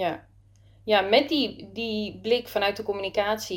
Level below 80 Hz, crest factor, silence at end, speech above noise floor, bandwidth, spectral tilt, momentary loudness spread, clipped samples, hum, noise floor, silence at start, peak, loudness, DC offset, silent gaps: -58 dBFS; 18 dB; 0 s; 30 dB; 17 kHz; -4 dB/octave; 10 LU; under 0.1%; none; -55 dBFS; 0 s; -8 dBFS; -25 LUFS; under 0.1%; none